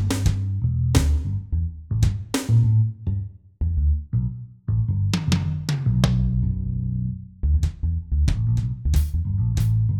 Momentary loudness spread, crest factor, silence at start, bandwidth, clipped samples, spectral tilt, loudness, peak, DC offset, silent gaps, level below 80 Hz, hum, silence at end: 8 LU; 18 dB; 0 s; 17 kHz; under 0.1%; -6.5 dB/octave; -23 LUFS; -4 dBFS; under 0.1%; none; -26 dBFS; none; 0 s